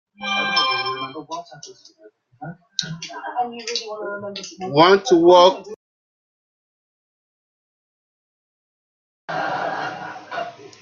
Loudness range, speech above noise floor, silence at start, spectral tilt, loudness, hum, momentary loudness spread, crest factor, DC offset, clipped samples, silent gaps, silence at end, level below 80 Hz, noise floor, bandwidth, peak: 13 LU; over 71 dB; 0.2 s; -4 dB/octave; -19 LUFS; none; 21 LU; 22 dB; under 0.1%; under 0.1%; 5.76-9.28 s; 0.15 s; -66 dBFS; under -90 dBFS; 7.4 kHz; 0 dBFS